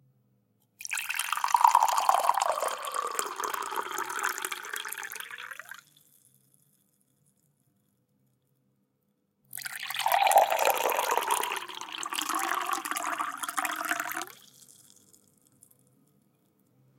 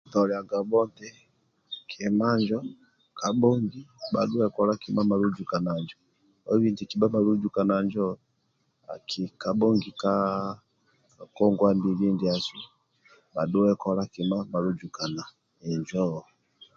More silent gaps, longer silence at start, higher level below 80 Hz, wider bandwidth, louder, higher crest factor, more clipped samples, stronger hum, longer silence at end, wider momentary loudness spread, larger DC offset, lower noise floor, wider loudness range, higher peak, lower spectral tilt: neither; first, 0.8 s vs 0.1 s; second, -86 dBFS vs -64 dBFS; first, 17 kHz vs 7.4 kHz; about the same, -29 LUFS vs -27 LUFS; first, 26 dB vs 18 dB; neither; neither; first, 2.35 s vs 0.55 s; about the same, 16 LU vs 17 LU; neither; about the same, -75 dBFS vs -72 dBFS; first, 14 LU vs 3 LU; first, -4 dBFS vs -8 dBFS; second, 0.5 dB/octave vs -7 dB/octave